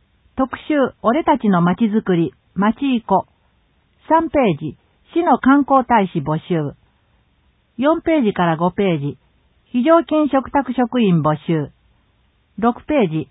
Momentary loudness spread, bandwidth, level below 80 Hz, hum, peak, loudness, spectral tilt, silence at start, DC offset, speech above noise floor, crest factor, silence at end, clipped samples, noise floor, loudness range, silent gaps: 9 LU; 4 kHz; -50 dBFS; none; -2 dBFS; -17 LUFS; -12.5 dB/octave; 0.35 s; under 0.1%; 43 dB; 16 dB; 0.05 s; under 0.1%; -60 dBFS; 3 LU; none